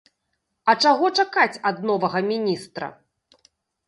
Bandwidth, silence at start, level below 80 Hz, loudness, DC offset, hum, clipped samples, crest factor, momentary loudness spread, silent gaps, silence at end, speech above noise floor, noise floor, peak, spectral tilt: 11.5 kHz; 0.65 s; -72 dBFS; -21 LUFS; under 0.1%; none; under 0.1%; 20 dB; 14 LU; none; 0.95 s; 55 dB; -76 dBFS; -4 dBFS; -4 dB/octave